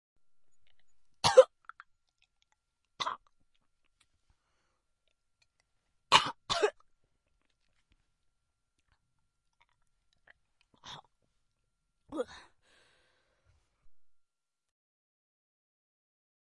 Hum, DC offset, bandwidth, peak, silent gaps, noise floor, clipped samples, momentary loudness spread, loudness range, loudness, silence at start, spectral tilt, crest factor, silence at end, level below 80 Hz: none; under 0.1%; 11 kHz; -6 dBFS; none; -82 dBFS; under 0.1%; 26 LU; 18 LU; -28 LUFS; 1.25 s; -2 dB/octave; 32 dB; 2.6 s; -72 dBFS